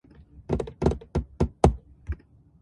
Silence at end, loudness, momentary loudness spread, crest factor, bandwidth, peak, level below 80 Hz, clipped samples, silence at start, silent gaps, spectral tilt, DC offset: 0.45 s; -27 LUFS; 16 LU; 26 dB; 11.5 kHz; -2 dBFS; -34 dBFS; under 0.1%; 0.35 s; none; -8 dB/octave; under 0.1%